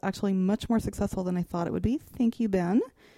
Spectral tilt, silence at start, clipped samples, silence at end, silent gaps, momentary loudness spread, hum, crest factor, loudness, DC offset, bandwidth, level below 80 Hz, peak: -7.5 dB/octave; 0.05 s; under 0.1%; 0.3 s; none; 5 LU; none; 14 dB; -28 LUFS; under 0.1%; 15 kHz; -46 dBFS; -14 dBFS